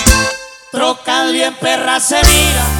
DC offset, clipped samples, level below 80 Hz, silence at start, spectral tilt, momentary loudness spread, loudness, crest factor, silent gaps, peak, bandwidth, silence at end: under 0.1%; 0.4%; -18 dBFS; 0 s; -2.5 dB/octave; 10 LU; -12 LUFS; 12 dB; none; 0 dBFS; over 20 kHz; 0 s